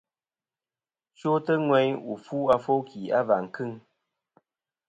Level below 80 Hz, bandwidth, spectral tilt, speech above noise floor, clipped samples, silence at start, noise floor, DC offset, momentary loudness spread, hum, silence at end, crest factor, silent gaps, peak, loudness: -68 dBFS; 8 kHz; -7.5 dB/octave; over 65 dB; under 0.1%; 1.25 s; under -90 dBFS; under 0.1%; 12 LU; none; 1.1 s; 20 dB; none; -8 dBFS; -26 LUFS